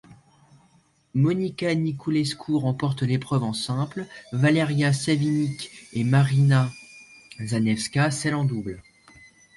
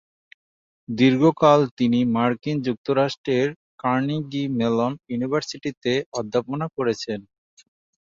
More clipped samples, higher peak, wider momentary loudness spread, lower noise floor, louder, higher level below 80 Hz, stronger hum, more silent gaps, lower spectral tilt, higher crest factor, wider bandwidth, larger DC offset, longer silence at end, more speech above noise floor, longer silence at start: neither; second, -10 dBFS vs -2 dBFS; about the same, 13 LU vs 11 LU; second, -61 dBFS vs under -90 dBFS; about the same, -24 LUFS vs -22 LUFS; about the same, -58 dBFS vs -62 dBFS; neither; second, none vs 1.71-1.77 s, 2.78-2.85 s, 3.18-3.24 s, 3.56-3.78 s, 5.77-5.81 s, 6.06-6.12 s; about the same, -6 dB/octave vs -6.5 dB/octave; about the same, 16 dB vs 20 dB; first, 11.5 kHz vs 7.6 kHz; neither; about the same, 0.75 s vs 0.8 s; second, 38 dB vs over 68 dB; second, 0.1 s vs 0.9 s